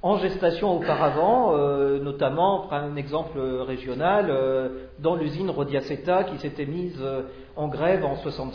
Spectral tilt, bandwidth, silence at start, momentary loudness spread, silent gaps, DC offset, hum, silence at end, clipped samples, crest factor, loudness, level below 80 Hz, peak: -8.5 dB/octave; 5.4 kHz; 0 s; 9 LU; none; under 0.1%; none; 0 s; under 0.1%; 14 dB; -25 LUFS; -48 dBFS; -10 dBFS